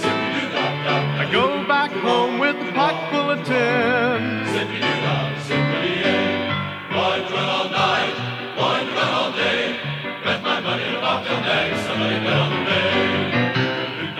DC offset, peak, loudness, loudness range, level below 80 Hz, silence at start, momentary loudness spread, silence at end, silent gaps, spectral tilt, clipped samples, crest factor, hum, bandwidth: under 0.1%; -4 dBFS; -20 LUFS; 2 LU; -60 dBFS; 0 s; 4 LU; 0 s; none; -5.5 dB/octave; under 0.1%; 16 dB; none; 13 kHz